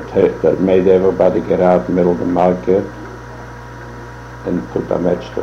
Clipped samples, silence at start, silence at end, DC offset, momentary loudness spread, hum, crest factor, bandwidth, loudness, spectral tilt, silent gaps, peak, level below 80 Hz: under 0.1%; 0 s; 0 s; under 0.1%; 20 LU; 60 Hz at -30 dBFS; 14 dB; 7.4 kHz; -15 LUFS; -8.5 dB/octave; none; 0 dBFS; -40 dBFS